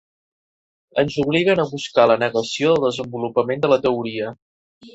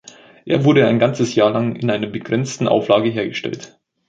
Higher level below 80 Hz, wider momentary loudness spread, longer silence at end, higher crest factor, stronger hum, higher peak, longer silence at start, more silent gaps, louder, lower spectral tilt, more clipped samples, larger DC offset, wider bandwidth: about the same, -58 dBFS vs -58 dBFS; about the same, 10 LU vs 10 LU; second, 0.05 s vs 0.4 s; about the same, 18 dB vs 16 dB; neither; about the same, -2 dBFS vs -2 dBFS; first, 0.95 s vs 0.45 s; first, 4.42-4.81 s vs none; about the same, -19 LUFS vs -17 LUFS; about the same, -5.5 dB/octave vs -6 dB/octave; neither; neither; about the same, 8.2 kHz vs 9 kHz